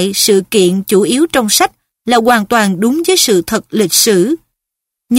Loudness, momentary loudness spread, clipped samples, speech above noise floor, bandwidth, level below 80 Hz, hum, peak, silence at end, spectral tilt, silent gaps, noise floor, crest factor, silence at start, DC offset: -11 LUFS; 6 LU; under 0.1%; 69 dB; 16.5 kHz; -48 dBFS; none; 0 dBFS; 0 s; -3 dB/octave; none; -80 dBFS; 12 dB; 0 s; under 0.1%